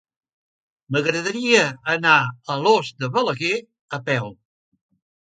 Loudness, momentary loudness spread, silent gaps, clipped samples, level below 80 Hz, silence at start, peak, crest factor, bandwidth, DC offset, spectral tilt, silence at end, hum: -20 LUFS; 10 LU; 3.81-3.88 s; under 0.1%; -68 dBFS; 0.9 s; -2 dBFS; 22 dB; 9.4 kHz; under 0.1%; -4 dB/octave; 0.9 s; none